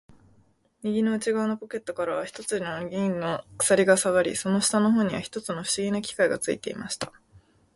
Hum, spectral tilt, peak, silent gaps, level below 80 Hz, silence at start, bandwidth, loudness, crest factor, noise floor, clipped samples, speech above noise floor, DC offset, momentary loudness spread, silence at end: none; -4 dB/octave; -6 dBFS; none; -62 dBFS; 0.85 s; 12 kHz; -26 LUFS; 20 dB; -63 dBFS; under 0.1%; 37 dB; under 0.1%; 12 LU; 0.4 s